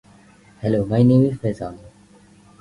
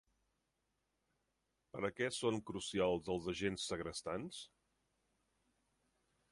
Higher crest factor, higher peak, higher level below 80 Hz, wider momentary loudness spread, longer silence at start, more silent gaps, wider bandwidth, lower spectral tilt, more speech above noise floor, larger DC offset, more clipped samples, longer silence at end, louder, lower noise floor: about the same, 18 dB vs 22 dB; first, -4 dBFS vs -22 dBFS; first, -48 dBFS vs -68 dBFS; about the same, 15 LU vs 13 LU; second, 0.6 s vs 1.75 s; neither; about the same, 11 kHz vs 11.5 kHz; first, -9.5 dB/octave vs -4 dB/octave; second, 32 dB vs 45 dB; neither; neither; second, 0.75 s vs 1.85 s; first, -19 LUFS vs -41 LUFS; second, -50 dBFS vs -85 dBFS